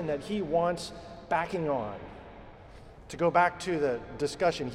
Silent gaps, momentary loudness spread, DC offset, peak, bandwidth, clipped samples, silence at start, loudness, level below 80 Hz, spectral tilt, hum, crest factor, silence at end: none; 20 LU; under 0.1%; -12 dBFS; 13 kHz; under 0.1%; 0 s; -30 LUFS; -54 dBFS; -5.5 dB/octave; none; 18 dB; 0 s